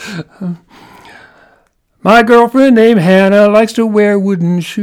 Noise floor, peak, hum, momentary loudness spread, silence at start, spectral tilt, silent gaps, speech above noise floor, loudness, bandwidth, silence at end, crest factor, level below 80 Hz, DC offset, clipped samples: -53 dBFS; 0 dBFS; none; 17 LU; 0 s; -6.5 dB/octave; none; 45 dB; -8 LUFS; 16 kHz; 0 s; 10 dB; -48 dBFS; under 0.1%; 0.3%